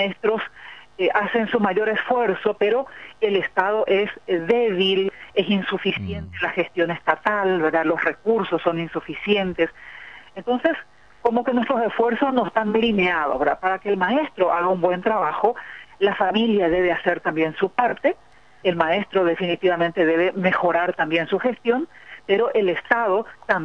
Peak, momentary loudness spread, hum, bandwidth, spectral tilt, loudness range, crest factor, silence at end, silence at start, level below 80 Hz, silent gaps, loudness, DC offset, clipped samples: -4 dBFS; 6 LU; none; 6.8 kHz; -7 dB/octave; 2 LU; 18 dB; 0 s; 0 s; -56 dBFS; none; -21 LUFS; 0.2%; under 0.1%